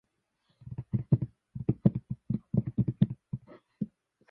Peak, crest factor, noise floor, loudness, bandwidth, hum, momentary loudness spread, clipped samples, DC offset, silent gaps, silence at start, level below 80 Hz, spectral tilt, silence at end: -10 dBFS; 22 dB; -76 dBFS; -32 LUFS; 3.9 kHz; none; 14 LU; under 0.1%; under 0.1%; none; 0.65 s; -54 dBFS; -12.5 dB/octave; 0.45 s